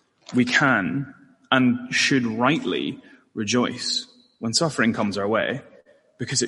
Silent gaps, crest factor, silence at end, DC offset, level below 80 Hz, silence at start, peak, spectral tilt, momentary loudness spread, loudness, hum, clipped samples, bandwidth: none; 20 dB; 0 s; under 0.1%; -64 dBFS; 0.3 s; -4 dBFS; -3.5 dB/octave; 14 LU; -22 LUFS; none; under 0.1%; 11.5 kHz